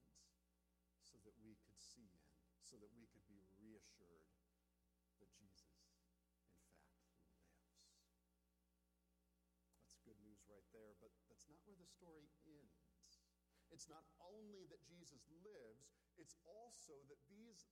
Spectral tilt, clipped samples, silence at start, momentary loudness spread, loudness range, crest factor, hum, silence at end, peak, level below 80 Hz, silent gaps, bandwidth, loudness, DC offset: -3.5 dB/octave; under 0.1%; 0 s; 7 LU; 4 LU; 24 dB; 60 Hz at -85 dBFS; 0 s; -46 dBFS; -86 dBFS; none; 13.5 kHz; -66 LUFS; under 0.1%